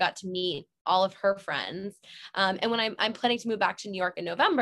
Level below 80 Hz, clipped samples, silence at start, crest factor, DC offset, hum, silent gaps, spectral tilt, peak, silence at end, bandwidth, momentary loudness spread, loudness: -74 dBFS; under 0.1%; 0 s; 20 dB; under 0.1%; none; 0.81-0.85 s; -4 dB/octave; -8 dBFS; 0 s; 12 kHz; 10 LU; -28 LUFS